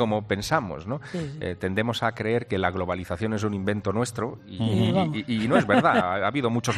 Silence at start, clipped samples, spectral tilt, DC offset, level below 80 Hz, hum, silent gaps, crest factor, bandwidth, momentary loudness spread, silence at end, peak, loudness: 0 s; under 0.1%; -6 dB/octave; under 0.1%; -56 dBFS; none; none; 18 dB; 14 kHz; 12 LU; 0 s; -6 dBFS; -25 LUFS